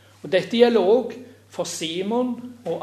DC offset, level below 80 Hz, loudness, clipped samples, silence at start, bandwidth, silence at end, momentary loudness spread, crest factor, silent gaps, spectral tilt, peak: under 0.1%; -76 dBFS; -21 LUFS; under 0.1%; 0.25 s; 13.5 kHz; 0 s; 16 LU; 20 dB; none; -4.5 dB/octave; -2 dBFS